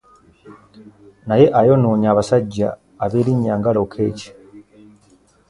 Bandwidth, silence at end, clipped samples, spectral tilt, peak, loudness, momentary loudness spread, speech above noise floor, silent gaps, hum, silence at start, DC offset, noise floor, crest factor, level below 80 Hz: 11 kHz; 0.9 s; under 0.1%; -8 dB/octave; 0 dBFS; -17 LUFS; 12 LU; 38 dB; none; none; 0.45 s; under 0.1%; -54 dBFS; 18 dB; -50 dBFS